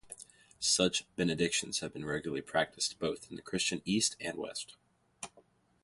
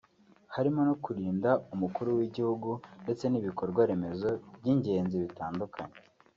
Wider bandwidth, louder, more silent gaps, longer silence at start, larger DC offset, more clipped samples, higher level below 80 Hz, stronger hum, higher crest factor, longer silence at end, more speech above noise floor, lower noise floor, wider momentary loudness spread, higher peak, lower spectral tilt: first, 11.5 kHz vs 7.4 kHz; about the same, -33 LUFS vs -32 LUFS; neither; second, 0.05 s vs 0.5 s; neither; neither; about the same, -64 dBFS vs -68 dBFS; neither; about the same, 22 dB vs 18 dB; about the same, 0.45 s vs 0.4 s; about the same, 32 dB vs 30 dB; first, -66 dBFS vs -60 dBFS; first, 18 LU vs 9 LU; about the same, -14 dBFS vs -14 dBFS; second, -2.5 dB/octave vs -8 dB/octave